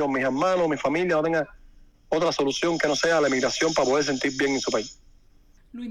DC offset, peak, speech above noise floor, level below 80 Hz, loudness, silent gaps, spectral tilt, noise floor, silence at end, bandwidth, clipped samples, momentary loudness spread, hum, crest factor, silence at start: under 0.1%; -10 dBFS; 31 dB; -54 dBFS; -23 LUFS; none; -3.5 dB/octave; -55 dBFS; 0 s; 13 kHz; under 0.1%; 7 LU; none; 14 dB; 0 s